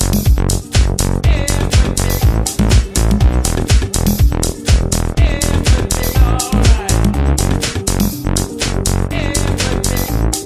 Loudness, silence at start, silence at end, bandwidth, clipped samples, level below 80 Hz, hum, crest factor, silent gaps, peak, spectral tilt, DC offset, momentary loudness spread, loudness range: -15 LUFS; 0 s; 0 s; 15.5 kHz; under 0.1%; -16 dBFS; none; 12 dB; none; 0 dBFS; -4.5 dB/octave; under 0.1%; 3 LU; 2 LU